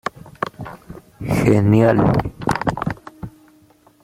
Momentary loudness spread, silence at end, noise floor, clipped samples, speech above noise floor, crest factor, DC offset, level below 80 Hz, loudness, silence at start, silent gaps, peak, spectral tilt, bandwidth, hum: 22 LU; 0.75 s; -52 dBFS; under 0.1%; 38 dB; 18 dB; under 0.1%; -40 dBFS; -18 LUFS; 0.05 s; none; -2 dBFS; -8 dB/octave; 15.5 kHz; none